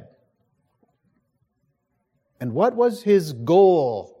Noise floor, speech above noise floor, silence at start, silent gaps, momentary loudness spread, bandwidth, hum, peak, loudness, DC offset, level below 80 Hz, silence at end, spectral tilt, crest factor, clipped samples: -72 dBFS; 53 dB; 2.4 s; none; 12 LU; 14.5 kHz; none; -6 dBFS; -19 LUFS; under 0.1%; -74 dBFS; 0.15 s; -7.5 dB/octave; 16 dB; under 0.1%